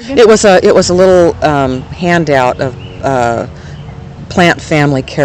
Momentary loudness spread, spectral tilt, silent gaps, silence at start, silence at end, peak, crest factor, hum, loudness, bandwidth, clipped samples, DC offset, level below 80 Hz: 19 LU; -5 dB/octave; none; 0 s; 0 s; 0 dBFS; 10 dB; none; -9 LUFS; 12 kHz; 3%; under 0.1%; -34 dBFS